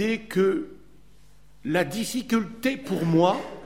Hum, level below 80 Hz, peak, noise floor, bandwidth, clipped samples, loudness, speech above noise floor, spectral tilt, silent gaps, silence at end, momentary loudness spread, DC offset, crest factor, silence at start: none; -56 dBFS; -6 dBFS; -56 dBFS; 16.5 kHz; under 0.1%; -25 LUFS; 31 dB; -5.5 dB/octave; none; 0 s; 9 LU; 0.4%; 20 dB; 0 s